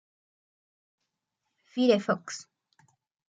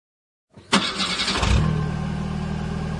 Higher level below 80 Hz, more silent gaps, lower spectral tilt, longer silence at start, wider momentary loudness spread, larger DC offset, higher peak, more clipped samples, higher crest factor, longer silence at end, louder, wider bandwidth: second, -82 dBFS vs -32 dBFS; neither; about the same, -5 dB/octave vs -4.5 dB/octave; first, 1.75 s vs 0.55 s; first, 16 LU vs 8 LU; neither; second, -10 dBFS vs -4 dBFS; neither; about the same, 22 dB vs 20 dB; first, 0.85 s vs 0 s; second, -27 LUFS vs -23 LUFS; second, 9.2 kHz vs 11 kHz